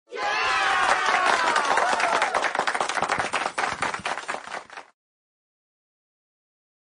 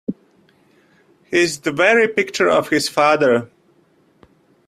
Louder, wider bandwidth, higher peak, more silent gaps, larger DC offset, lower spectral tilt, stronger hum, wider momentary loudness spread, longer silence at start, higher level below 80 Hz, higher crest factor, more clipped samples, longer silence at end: second, -23 LUFS vs -16 LUFS; second, 10.5 kHz vs 15 kHz; second, -6 dBFS vs -2 dBFS; neither; neither; second, -1 dB/octave vs -4 dB/octave; neither; first, 12 LU vs 6 LU; about the same, 0.1 s vs 0.1 s; about the same, -62 dBFS vs -60 dBFS; about the same, 20 dB vs 18 dB; neither; first, 2.1 s vs 1.2 s